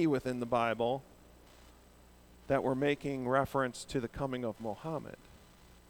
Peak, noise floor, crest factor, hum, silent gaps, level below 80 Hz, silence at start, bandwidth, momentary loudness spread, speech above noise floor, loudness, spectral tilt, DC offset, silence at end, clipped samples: -14 dBFS; -59 dBFS; 20 dB; 60 Hz at -65 dBFS; none; -60 dBFS; 0 s; over 20 kHz; 10 LU; 26 dB; -34 LUFS; -6 dB/octave; under 0.1%; 0.55 s; under 0.1%